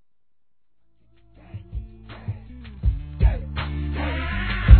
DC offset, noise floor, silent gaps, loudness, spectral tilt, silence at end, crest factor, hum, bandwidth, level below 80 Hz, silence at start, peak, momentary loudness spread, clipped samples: 0.2%; -81 dBFS; none; -28 LUFS; -10.5 dB/octave; 0 s; 22 dB; none; 4.5 kHz; -24 dBFS; 1.55 s; 0 dBFS; 18 LU; under 0.1%